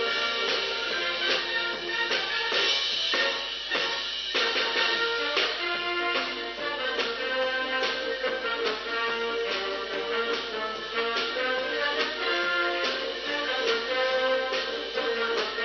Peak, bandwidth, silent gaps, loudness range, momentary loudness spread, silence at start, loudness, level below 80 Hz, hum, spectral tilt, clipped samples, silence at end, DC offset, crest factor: -12 dBFS; 6.8 kHz; none; 3 LU; 5 LU; 0 s; -26 LUFS; -60 dBFS; none; -1 dB/octave; under 0.1%; 0 s; under 0.1%; 16 dB